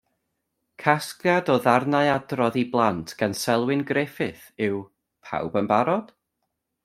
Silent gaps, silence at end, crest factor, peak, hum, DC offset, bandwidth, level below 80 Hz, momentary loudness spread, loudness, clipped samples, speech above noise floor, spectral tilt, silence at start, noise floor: none; 0.8 s; 24 dB; -2 dBFS; none; under 0.1%; 16 kHz; -64 dBFS; 9 LU; -24 LUFS; under 0.1%; 56 dB; -5.5 dB/octave; 0.8 s; -79 dBFS